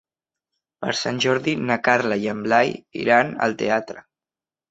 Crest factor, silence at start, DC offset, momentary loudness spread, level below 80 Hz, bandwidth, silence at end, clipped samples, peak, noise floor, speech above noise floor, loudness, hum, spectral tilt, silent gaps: 20 dB; 0.8 s; under 0.1%; 8 LU; -62 dBFS; 8.2 kHz; 0.7 s; under 0.1%; -2 dBFS; under -90 dBFS; over 69 dB; -21 LUFS; none; -4.5 dB/octave; none